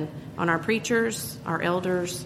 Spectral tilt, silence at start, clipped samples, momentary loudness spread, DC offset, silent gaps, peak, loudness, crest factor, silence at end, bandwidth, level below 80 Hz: -4.5 dB/octave; 0 s; under 0.1%; 7 LU; under 0.1%; none; -8 dBFS; -26 LUFS; 18 dB; 0 s; 15.5 kHz; -58 dBFS